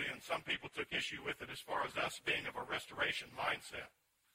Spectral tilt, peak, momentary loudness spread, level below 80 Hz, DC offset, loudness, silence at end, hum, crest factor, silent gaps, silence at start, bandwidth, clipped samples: -2.5 dB/octave; -24 dBFS; 6 LU; -70 dBFS; under 0.1%; -40 LUFS; 0.45 s; none; 18 dB; none; 0 s; 16 kHz; under 0.1%